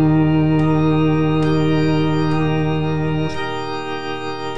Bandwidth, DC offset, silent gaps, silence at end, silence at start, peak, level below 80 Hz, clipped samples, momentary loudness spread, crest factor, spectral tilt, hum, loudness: 7.4 kHz; 3%; none; 0 s; 0 s; -6 dBFS; -42 dBFS; under 0.1%; 9 LU; 12 dB; -8 dB/octave; none; -18 LUFS